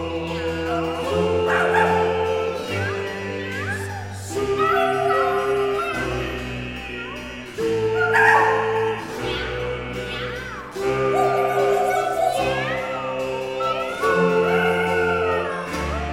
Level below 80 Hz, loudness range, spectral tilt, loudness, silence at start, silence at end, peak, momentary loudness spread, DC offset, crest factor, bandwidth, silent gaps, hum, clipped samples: -42 dBFS; 2 LU; -5 dB/octave; -22 LUFS; 0 s; 0 s; -2 dBFS; 10 LU; under 0.1%; 20 dB; 16 kHz; none; none; under 0.1%